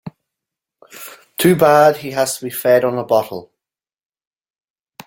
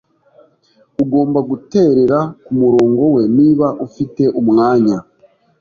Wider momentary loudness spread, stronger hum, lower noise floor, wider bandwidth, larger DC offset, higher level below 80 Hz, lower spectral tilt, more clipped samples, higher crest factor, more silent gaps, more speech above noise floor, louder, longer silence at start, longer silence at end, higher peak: first, 22 LU vs 9 LU; neither; first, -89 dBFS vs -54 dBFS; first, 17 kHz vs 7 kHz; neither; second, -60 dBFS vs -52 dBFS; second, -5 dB/octave vs -9 dB/octave; neither; first, 18 dB vs 12 dB; neither; first, 75 dB vs 42 dB; about the same, -15 LUFS vs -14 LUFS; second, 0.05 s vs 1 s; first, 1.6 s vs 0.6 s; about the same, 0 dBFS vs -2 dBFS